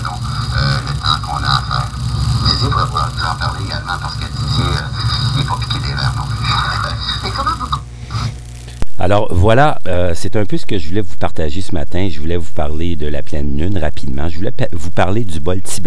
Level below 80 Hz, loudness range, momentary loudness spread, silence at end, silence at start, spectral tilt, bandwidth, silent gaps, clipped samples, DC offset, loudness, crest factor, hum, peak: -26 dBFS; 5 LU; 8 LU; 0 s; 0 s; -5.5 dB/octave; 11 kHz; none; under 0.1%; under 0.1%; -18 LUFS; 12 dB; none; 0 dBFS